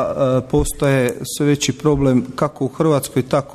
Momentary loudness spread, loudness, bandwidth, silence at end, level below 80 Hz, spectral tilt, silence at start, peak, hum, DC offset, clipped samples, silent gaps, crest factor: 4 LU; -18 LUFS; 14 kHz; 0 s; -34 dBFS; -5.5 dB/octave; 0 s; -4 dBFS; none; under 0.1%; under 0.1%; none; 12 dB